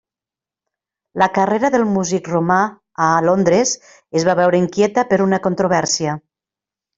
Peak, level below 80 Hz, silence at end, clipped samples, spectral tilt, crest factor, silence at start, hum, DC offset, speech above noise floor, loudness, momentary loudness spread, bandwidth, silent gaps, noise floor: -2 dBFS; -56 dBFS; 0.8 s; under 0.1%; -4.5 dB/octave; 16 dB; 1.15 s; none; under 0.1%; 73 dB; -17 LUFS; 7 LU; 7.8 kHz; none; -89 dBFS